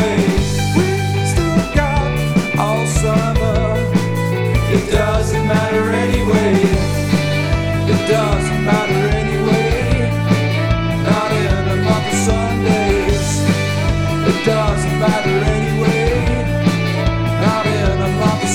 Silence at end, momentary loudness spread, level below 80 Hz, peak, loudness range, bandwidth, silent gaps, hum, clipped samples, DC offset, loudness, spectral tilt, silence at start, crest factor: 0 s; 2 LU; -24 dBFS; -2 dBFS; 1 LU; 17 kHz; none; none; under 0.1%; 0.4%; -16 LUFS; -6 dB/octave; 0 s; 14 dB